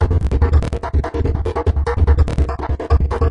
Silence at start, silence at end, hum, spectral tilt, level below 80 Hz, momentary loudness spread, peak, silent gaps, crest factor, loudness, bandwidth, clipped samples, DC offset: 0 s; 0 s; none; -8.5 dB/octave; -18 dBFS; 5 LU; -2 dBFS; none; 12 dB; -18 LUFS; 6.8 kHz; under 0.1%; under 0.1%